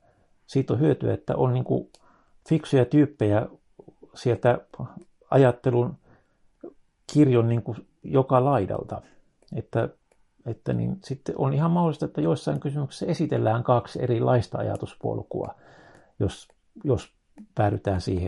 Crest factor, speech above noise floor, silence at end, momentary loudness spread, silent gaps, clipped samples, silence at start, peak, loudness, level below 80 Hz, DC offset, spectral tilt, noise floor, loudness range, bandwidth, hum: 20 dB; 37 dB; 0 s; 14 LU; none; under 0.1%; 0.5 s; -6 dBFS; -25 LUFS; -56 dBFS; under 0.1%; -8.5 dB/octave; -61 dBFS; 5 LU; 11 kHz; none